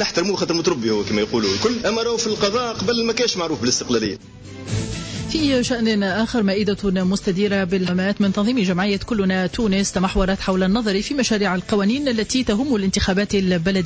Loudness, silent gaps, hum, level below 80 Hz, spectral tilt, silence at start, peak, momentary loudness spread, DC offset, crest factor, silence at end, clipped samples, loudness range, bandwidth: -20 LUFS; none; none; -38 dBFS; -4.5 dB/octave; 0 s; -6 dBFS; 3 LU; under 0.1%; 14 dB; 0 s; under 0.1%; 2 LU; 8 kHz